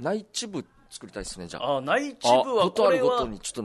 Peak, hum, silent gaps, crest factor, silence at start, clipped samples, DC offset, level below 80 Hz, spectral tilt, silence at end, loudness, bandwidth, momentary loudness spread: -8 dBFS; none; none; 18 dB; 0 s; under 0.1%; under 0.1%; -52 dBFS; -3.5 dB/octave; 0 s; -24 LUFS; 12 kHz; 16 LU